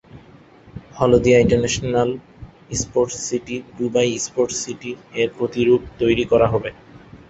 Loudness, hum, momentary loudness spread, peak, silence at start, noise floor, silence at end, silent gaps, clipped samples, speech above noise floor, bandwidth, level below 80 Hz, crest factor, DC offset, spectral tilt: -19 LUFS; none; 14 LU; -2 dBFS; 0.15 s; -47 dBFS; 0.15 s; none; under 0.1%; 28 dB; 8.2 kHz; -42 dBFS; 18 dB; under 0.1%; -5 dB/octave